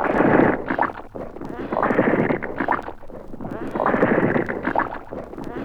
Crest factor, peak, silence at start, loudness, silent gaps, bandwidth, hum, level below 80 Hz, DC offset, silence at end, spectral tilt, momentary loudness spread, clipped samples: 18 dB; -4 dBFS; 0 s; -21 LUFS; none; 9.4 kHz; none; -42 dBFS; under 0.1%; 0 s; -8.5 dB/octave; 17 LU; under 0.1%